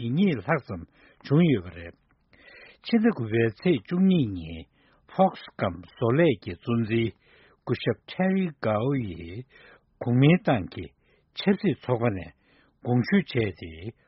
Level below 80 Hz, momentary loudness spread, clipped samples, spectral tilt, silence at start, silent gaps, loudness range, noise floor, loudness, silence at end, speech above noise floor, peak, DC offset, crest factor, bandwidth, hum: -56 dBFS; 18 LU; under 0.1%; -6.5 dB/octave; 0 s; none; 2 LU; -56 dBFS; -25 LUFS; 0.15 s; 31 dB; -8 dBFS; under 0.1%; 18 dB; 5.8 kHz; none